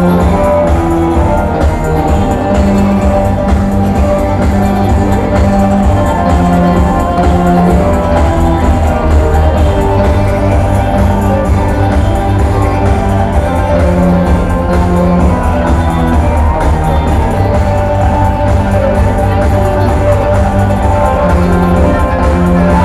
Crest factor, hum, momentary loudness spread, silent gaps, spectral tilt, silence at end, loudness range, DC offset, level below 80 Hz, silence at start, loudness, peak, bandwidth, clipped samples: 8 dB; none; 2 LU; none; -8 dB/octave; 0 s; 1 LU; under 0.1%; -14 dBFS; 0 s; -10 LUFS; 0 dBFS; 13 kHz; under 0.1%